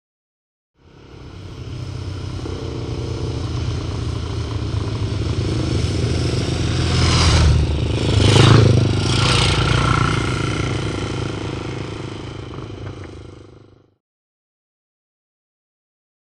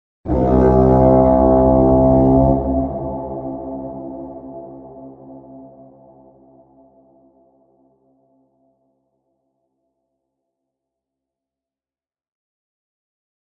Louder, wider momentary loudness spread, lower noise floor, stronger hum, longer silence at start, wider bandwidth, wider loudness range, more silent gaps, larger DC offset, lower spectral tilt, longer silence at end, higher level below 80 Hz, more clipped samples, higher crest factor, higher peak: second, -19 LUFS vs -15 LUFS; second, 18 LU vs 23 LU; second, -47 dBFS vs under -90 dBFS; neither; first, 1.05 s vs 0.25 s; first, 11 kHz vs 2.5 kHz; second, 16 LU vs 24 LU; neither; neither; second, -5.5 dB/octave vs -12.5 dB/octave; second, 2.7 s vs 7.9 s; about the same, -28 dBFS vs -30 dBFS; neither; about the same, 20 dB vs 18 dB; about the same, 0 dBFS vs 0 dBFS